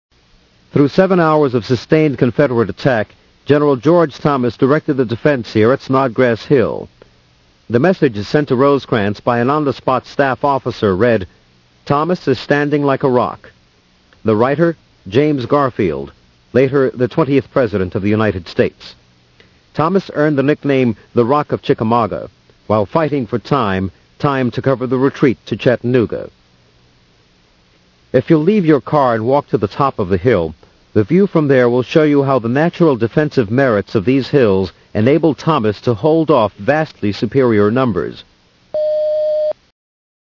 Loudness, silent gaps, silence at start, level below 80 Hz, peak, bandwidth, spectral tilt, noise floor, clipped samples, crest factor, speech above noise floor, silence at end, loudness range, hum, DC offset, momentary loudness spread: -15 LUFS; none; 0.75 s; -50 dBFS; 0 dBFS; 6 kHz; -8 dB/octave; -52 dBFS; under 0.1%; 14 dB; 38 dB; 0.7 s; 3 LU; none; under 0.1%; 7 LU